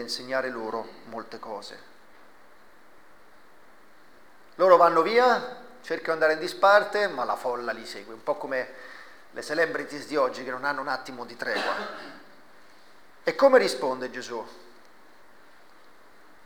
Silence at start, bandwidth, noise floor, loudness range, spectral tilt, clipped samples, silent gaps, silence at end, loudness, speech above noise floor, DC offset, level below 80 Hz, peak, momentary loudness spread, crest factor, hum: 0 s; 20 kHz; -56 dBFS; 13 LU; -3.5 dB/octave; under 0.1%; none; 1.9 s; -25 LUFS; 31 dB; 0.3%; -74 dBFS; -4 dBFS; 20 LU; 22 dB; none